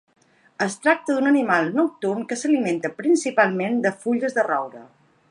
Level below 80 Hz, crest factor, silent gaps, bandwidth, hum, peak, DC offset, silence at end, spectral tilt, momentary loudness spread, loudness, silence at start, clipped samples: -76 dBFS; 18 dB; none; 11 kHz; none; -4 dBFS; under 0.1%; 0.45 s; -5 dB/octave; 7 LU; -21 LUFS; 0.6 s; under 0.1%